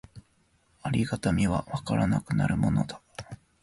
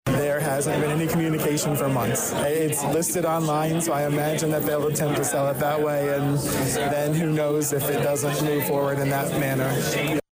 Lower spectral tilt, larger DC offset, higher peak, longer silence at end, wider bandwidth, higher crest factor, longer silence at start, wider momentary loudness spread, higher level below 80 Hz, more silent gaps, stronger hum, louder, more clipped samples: first, -7 dB/octave vs -5 dB/octave; neither; about the same, -14 dBFS vs -14 dBFS; first, 0.3 s vs 0.1 s; second, 11.5 kHz vs 16 kHz; first, 16 dB vs 10 dB; about the same, 0.15 s vs 0.05 s; first, 17 LU vs 1 LU; first, -46 dBFS vs -52 dBFS; neither; neither; second, -28 LUFS vs -23 LUFS; neither